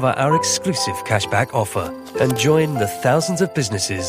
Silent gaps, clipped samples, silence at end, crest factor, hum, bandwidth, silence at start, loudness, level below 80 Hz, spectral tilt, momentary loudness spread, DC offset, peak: none; under 0.1%; 0 s; 14 dB; none; 15.5 kHz; 0 s; -19 LUFS; -52 dBFS; -4.5 dB/octave; 5 LU; under 0.1%; -4 dBFS